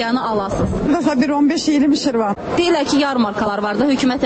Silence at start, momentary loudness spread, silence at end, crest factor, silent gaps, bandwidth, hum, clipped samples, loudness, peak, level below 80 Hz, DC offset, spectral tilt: 0 s; 4 LU; 0 s; 12 dB; none; 8.6 kHz; none; under 0.1%; -17 LUFS; -4 dBFS; -38 dBFS; under 0.1%; -5 dB/octave